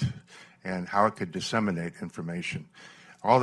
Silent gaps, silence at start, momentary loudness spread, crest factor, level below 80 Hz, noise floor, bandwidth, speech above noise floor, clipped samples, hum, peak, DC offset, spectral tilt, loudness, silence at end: none; 0 s; 23 LU; 22 dB; -58 dBFS; -50 dBFS; 12 kHz; 20 dB; under 0.1%; none; -6 dBFS; under 0.1%; -6 dB/octave; -30 LUFS; 0 s